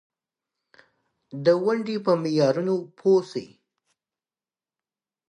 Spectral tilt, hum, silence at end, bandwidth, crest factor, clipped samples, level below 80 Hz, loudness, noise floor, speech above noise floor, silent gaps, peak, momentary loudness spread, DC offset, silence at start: -7 dB/octave; none; 1.85 s; 9.8 kHz; 20 dB; under 0.1%; -76 dBFS; -23 LUFS; under -90 dBFS; over 67 dB; none; -8 dBFS; 11 LU; under 0.1%; 1.35 s